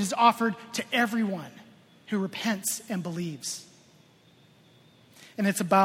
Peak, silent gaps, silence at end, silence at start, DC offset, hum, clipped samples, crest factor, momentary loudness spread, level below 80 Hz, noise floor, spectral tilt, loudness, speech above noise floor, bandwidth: -6 dBFS; none; 0 s; 0 s; under 0.1%; none; under 0.1%; 22 dB; 14 LU; -74 dBFS; -59 dBFS; -4 dB/octave; -28 LUFS; 32 dB; 17 kHz